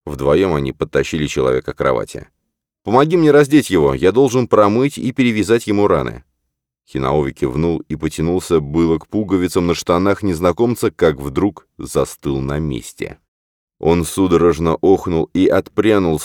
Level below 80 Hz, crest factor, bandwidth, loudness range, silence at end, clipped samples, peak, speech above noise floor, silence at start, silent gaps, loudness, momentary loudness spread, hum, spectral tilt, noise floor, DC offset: -38 dBFS; 16 dB; 18 kHz; 5 LU; 0 s; under 0.1%; 0 dBFS; 60 dB; 0.05 s; 13.28-13.68 s; -16 LUFS; 9 LU; none; -6.5 dB/octave; -75 dBFS; under 0.1%